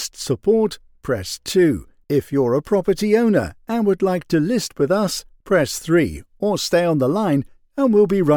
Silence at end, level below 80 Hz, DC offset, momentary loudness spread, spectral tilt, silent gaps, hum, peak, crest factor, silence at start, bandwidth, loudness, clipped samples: 0 s; -48 dBFS; under 0.1%; 8 LU; -5.5 dB/octave; none; none; -4 dBFS; 14 dB; 0 s; over 20 kHz; -19 LUFS; under 0.1%